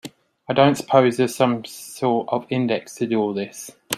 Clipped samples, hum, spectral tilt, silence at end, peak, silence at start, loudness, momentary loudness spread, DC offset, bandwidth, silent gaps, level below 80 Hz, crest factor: under 0.1%; none; -5.5 dB/octave; 0 s; 0 dBFS; 0.05 s; -21 LUFS; 14 LU; under 0.1%; 14.5 kHz; none; -66 dBFS; 20 dB